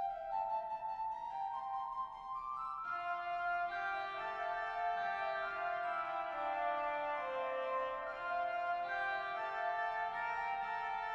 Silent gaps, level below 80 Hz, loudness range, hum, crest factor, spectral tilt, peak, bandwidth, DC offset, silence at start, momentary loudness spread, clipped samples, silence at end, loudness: none; -70 dBFS; 2 LU; none; 12 dB; -3.5 dB/octave; -26 dBFS; 7.6 kHz; under 0.1%; 0 s; 4 LU; under 0.1%; 0 s; -39 LUFS